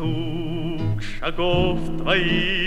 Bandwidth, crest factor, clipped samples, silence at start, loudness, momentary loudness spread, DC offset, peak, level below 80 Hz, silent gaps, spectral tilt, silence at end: 8.2 kHz; 16 dB; under 0.1%; 0 s; -23 LUFS; 8 LU; under 0.1%; -6 dBFS; -32 dBFS; none; -6.5 dB/octave; 0 s